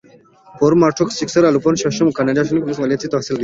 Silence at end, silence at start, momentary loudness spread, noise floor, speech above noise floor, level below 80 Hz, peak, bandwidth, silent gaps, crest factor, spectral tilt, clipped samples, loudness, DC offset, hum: 0 s; 0.55 s; 6 LU; -47 dBFS; 31 dB; -52 dBFS; -2 dBFS; 7.8 kHz; none; 14 dB; -5.5 dB/octave; under 0.1%; -16 LUFS; under 0.1%; none